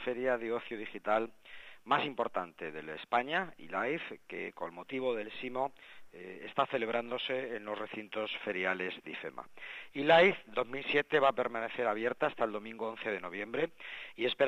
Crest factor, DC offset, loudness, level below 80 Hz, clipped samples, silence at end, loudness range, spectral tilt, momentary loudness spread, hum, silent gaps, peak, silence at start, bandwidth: 22 dB; under 0.1%; -34 LUFS; -76 dBFS; under 0.1%; 0 s; 7 LU; -5.5 dB/octave; 15 LU; none; none; -12 dBFS; 0 s; 12.5 kHz